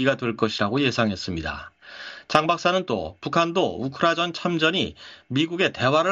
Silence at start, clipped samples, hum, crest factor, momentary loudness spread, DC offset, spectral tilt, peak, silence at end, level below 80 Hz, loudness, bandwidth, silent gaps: 0 s; under 0.1%; none; 22 dB; 13 LU; under 0.1%; -5 dB/octave; -2 dBFS; 0 s; -52 dBFS; -23 LUFS; 8.2 kHz; none